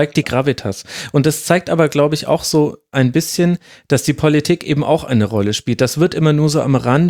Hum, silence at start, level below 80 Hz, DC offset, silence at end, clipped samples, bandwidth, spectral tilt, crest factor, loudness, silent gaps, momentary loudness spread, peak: none; 0 s; -48 dBFS; under 0.1%; 0 s; under 0.1%; 17.5 kHz; -5.5 dB/octave; 14 dB; -16 LUFS; none; 5 LU; 0 dBFS